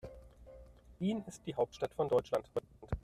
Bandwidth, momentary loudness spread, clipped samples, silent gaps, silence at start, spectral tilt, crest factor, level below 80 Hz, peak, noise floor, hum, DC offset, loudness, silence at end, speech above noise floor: 14 kHz; 24 LU; under 0.1%; none; 0.05 s; -6.5 dB/octave; 18 dB; -54 dBFS; -20 dBFS; -57 dBFS; none; under 0.1%; -37 LUFS; 0.05 s; 21 dB